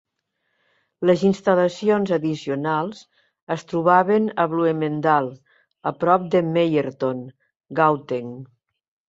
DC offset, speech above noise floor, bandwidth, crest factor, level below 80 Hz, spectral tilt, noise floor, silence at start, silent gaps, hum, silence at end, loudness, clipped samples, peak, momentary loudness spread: under 0.1%; 55 dB; 7.8 kHz; 18 dB; -66 dBFS; -7 dB/octave; -75 dBFS; 1 s; 3.42-3.47 s; none; 0.65 s; -21 LUFS; under 0.1%; -2 dBFS; 12 LU